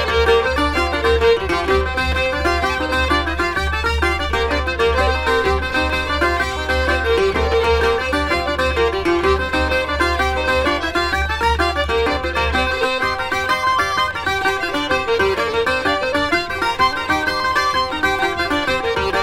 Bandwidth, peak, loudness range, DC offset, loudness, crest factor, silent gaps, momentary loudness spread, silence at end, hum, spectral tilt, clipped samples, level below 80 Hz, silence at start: 16 kHz; -4 dBFS; 1 LU; under 0.1%; -17 LUFS; 14 dB; none; 3 LU; 0 s; none; -4.5 dB/octave; under 0.1%; -28 dBFS; 0 s